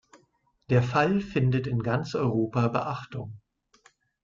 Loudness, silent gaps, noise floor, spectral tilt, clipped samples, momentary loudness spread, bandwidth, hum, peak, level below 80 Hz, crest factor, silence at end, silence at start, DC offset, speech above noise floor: -26 LUFS; none; -68 dBFS; -8 dB/octave; under 0.1%; 12 LU; 7.4 kHz; none; -10 dBFS; -56 dBFS; 18 dB; 0.85 s; 0.7 s; under 0.1%; 42 dB